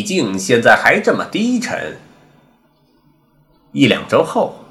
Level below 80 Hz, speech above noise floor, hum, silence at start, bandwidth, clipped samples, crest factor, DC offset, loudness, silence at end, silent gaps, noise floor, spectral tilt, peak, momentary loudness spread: -56 dBFS; 41 dB; none; 0 s; 16 kHz; 0.2%; 16 dB; under 0.1%; -14 LUFS; 0.05 s; none; -56 dBFS; -4.5 dB/octave; 0 dBFS; 13 LU